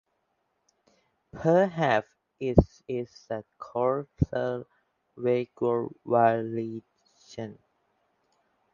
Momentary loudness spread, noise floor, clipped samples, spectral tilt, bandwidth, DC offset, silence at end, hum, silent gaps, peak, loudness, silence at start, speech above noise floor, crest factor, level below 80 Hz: 15 LU; -76 dBFS; under 0.1%; -8 dB/octave; 7.2 kHz; under 0.1%; 1.2 s; none; none; -2 dBFS; -28 LUFS; 1.35 s; 49 dB; 28 dB; -44 dBFS